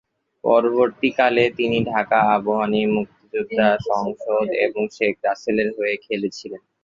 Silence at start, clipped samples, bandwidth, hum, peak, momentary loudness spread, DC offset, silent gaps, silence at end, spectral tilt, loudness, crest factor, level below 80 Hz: 0.45 s; under 0.1%; 7.6 kHz; none; -2 dBFS; 9 LU; under 0.1%; none; 0.25 s; -6 dB/octave; -20 LUFS; 18 dB; -58 dBFS